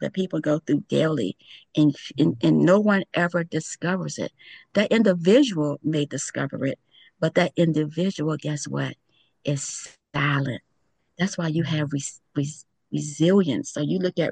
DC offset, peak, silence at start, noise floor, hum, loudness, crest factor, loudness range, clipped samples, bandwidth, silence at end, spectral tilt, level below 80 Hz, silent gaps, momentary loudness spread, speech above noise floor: under 0.1%; -6 dBFS; 0 s; -68 dBFS; none; -24 LUFS; 18 dB; 6 LU; under 0.1%; 10 kHz; 0 s; -5.5 dB/octave; -66 dBFS; none; 12 LU; 45 dB